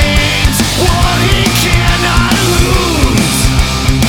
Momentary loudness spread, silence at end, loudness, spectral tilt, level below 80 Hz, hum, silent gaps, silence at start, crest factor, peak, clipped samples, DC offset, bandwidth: 1 LU; 0 s; -10 LUFS; -4 dB/octave; -16 dBFS; none; none; 0 s; 10 dB; 0 dBFS; under 0.1%; under 0.1%; 19 kHz